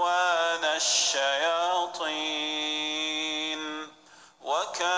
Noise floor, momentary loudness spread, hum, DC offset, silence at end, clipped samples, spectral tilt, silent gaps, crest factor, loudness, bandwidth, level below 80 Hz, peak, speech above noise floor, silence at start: -55 dBFS; 10 LU; none; under 0.1%; 0 s; under 0.1%; 1 dB/octave; none; 16 dB; -26 LUFS; 10.5 kHz; -82 dBFS; -12 dBFS; 27 dB; 0 s